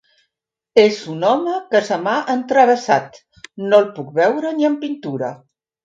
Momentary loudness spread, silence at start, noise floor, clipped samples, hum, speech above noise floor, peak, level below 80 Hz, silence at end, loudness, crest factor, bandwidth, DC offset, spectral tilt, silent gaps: 11 LU; 0.75 s; -80 dBFS; under 0.1%; none; 63 dB; 0 dBFS; -66 dBFS; 0.5 s; -17 LUFS; 18 dB; 7.8 kHz; under 0.1%; -5 dB/octave; none